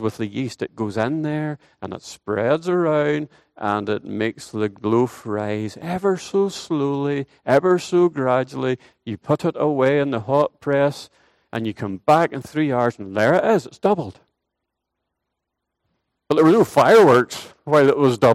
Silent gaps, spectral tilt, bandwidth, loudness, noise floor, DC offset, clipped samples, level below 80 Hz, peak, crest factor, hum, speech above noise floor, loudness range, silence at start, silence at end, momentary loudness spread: none; -6.5 dB/octave; 15 kHz; -20 LUFS; -80 dBFS; under 0.1%; under 0.1%; -62 dBFS; -2 dBFS; 18 dB; none; 60 dB; 5 LU; 0 s; 0 s; 13 LU